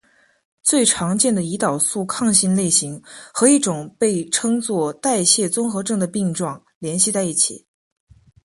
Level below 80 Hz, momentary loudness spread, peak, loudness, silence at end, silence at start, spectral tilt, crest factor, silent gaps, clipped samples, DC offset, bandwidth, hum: -60 dBFS; 10 LU; -2 dBFS; -18 LUFS; 0.85 s; 0.65 s; -3.5 dB/octave; 18 dB; 6.75-6.81 s; under 0.1%; under 0.1%; 12 kHz; none